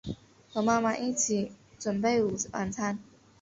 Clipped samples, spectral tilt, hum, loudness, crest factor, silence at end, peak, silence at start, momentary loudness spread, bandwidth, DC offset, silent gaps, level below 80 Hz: under 0.1%; -4 dB/octave; none; -30 LUFS; 18 dB; 0.4 s; -12 dBFS; 0.05 s; 13 LU; 8 kHz; under 0.1%; none; -60 dBFS